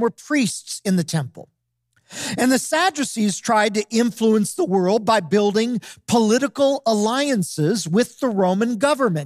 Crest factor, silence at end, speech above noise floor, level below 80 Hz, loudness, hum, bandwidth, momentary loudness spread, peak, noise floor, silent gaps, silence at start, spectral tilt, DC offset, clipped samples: 14 dB; 0 s; 48 dB; -68 dBFS; -20 LUFS; none; 15.5 kHz; 6 LU; -4 dBFS; -67 dBFS; none; 0 s; -4.5 dB/octave; under 0.1%; under 0.1%